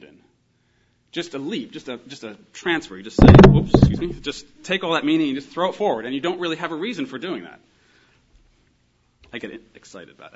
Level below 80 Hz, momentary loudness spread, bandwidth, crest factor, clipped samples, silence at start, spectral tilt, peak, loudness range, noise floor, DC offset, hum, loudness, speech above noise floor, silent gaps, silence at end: -32 dBFS; 23 LU; 8 kHz; 20 dB; under 0.1%; 1.15 s; -7.5 dB/octave; 0 dBFS; 16 LU; -64 dBFS; under 0.1%; 60 Hz at -40 dBFS; -18 LUFS; 45 dB; none; 0.05 s